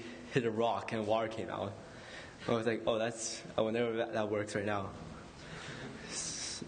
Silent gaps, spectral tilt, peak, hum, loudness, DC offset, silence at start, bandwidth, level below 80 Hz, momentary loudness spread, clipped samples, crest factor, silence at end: none; -4 dB/octave; -16 dBFS; none; -36 LUFS; under 0.1%; 0 s; 9.6 kHz; -64 dBFS; 15 LU; under 0.1%; 20 dB; 0 s